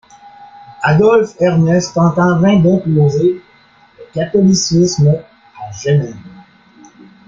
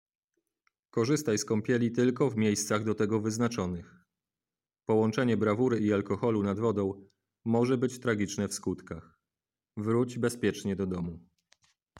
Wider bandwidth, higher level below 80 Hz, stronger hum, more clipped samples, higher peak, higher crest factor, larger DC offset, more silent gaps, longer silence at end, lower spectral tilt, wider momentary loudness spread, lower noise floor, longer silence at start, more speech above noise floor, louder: second, 7.6 kHz vs 16.5 kHz; first, -48 dBFS vs -64 dBFS; neither; neither; first, -2 dBFS vs -14 dBFS; second, 12 dB vs 18 dB; neither; neither; first, 1 s vs 0.8 s; about the same, -6.5 dB/octave vs -6 dB/octave; about the same, 12 LU vs 12 LU; second, -47 dBFS vs under -90 dBFS; second, 0.4 s vs 0.95 s; second, 36 dB vs over 61 dB; first, -13 LUFS vs -30 LUFS